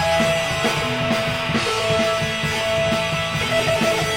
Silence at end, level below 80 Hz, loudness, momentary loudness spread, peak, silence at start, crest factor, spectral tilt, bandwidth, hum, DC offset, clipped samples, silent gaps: 0 s; -42 dBFS; -20 LUFS; 3 LU; -6 dBFS; 0 s; 14 dB; -4 dB/octave; 17.5 kHz; none; under 0.1%; under 0.1%; none